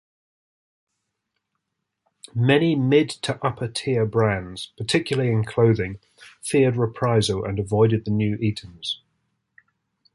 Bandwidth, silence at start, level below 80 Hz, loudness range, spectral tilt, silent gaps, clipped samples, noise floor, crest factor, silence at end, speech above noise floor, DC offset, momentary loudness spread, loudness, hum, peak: 11.5 kHz; 2.35 s; -50 dBFS; 2 LU; -6 dB/octave; none; under 0.1%; -80 dBFS; 20 dB; 1.2 s; 58 dB; under 0.1%; 12 LU; -22 LUFS; none; -4 dBFS